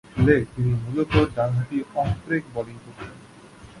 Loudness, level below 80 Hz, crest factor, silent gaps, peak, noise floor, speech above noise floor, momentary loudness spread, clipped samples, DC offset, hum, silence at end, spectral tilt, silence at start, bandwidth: -23 LUFS; -40 dBFS; 20 dB; none; -4 dBFS; -46 dBFS; 23 dB; 20 LU; under 0.1%; under 0.1%; none; 0 s; -8 dB/octave; 0.15 s; 11.5 kHz